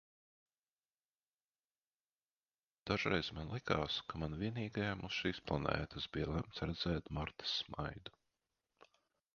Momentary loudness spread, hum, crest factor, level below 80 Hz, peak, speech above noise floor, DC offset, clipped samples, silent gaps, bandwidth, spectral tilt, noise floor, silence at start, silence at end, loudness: 7 LU; none; 26 dB; -58 dBFS; -18 dBFS; over 50 dB; under 0.1%; under 0.1%; none; 7 kHz; -3.5 dB/octave; under -90 dBFS; 2.85 s; 1.25 s; -40 LUFS